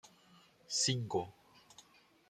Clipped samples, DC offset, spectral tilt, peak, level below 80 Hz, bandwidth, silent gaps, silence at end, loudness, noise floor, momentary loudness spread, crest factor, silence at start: under 0.1%; under 0.1%; -3 dB/octave; -20 dBFS; -78 dBFS; 15 kHz; none; 0.5 s; -35 LUFS; -65 dBFS; 18 LU; 20 dB; 0.05 s